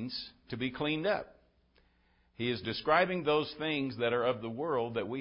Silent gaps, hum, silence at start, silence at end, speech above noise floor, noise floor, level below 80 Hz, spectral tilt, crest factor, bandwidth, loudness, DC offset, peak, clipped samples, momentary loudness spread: none; none; 0 s; 0 s; 37 dB; -69 dBFS; -64 dBFS; -9 dB/octave; 22 dB; 5.6 kHz; -33 LUFS; under 0.1%; -12 dBFS; under 0.1%; 10 LU